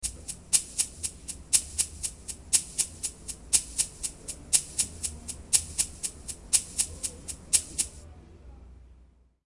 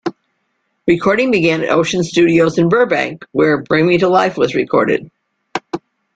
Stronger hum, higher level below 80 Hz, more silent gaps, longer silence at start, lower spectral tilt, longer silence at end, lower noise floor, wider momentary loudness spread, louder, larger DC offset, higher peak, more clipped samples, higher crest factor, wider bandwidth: neither; about the same, -50 dBFS vs -52 dBFS; neither; about the same, 0 s vs 0.05 s; second, 0 dB/octave vs -6 dB/octave; first, 0.55 s vs 0.4 s; second, -58 dBFS vs -67 dBFS; about the same, 12 LU vs 12 LU; second, -27 LUFS vs -14 LUFS; neither; second, -4 dBFS vs 0 dBFS; neither; first, 28 dB vs 14 dB; first, 11.5 kHz vs 9 kHz